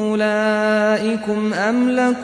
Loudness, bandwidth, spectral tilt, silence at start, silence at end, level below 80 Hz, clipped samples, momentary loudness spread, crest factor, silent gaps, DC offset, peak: -18 LUFS; 10.5 kHz; -5.5 dB/octave; 0 s; 0 s; -60 dBFS; under 0.1%; 4 LU; 12 dB; none; under 0.1%; -6 dBFS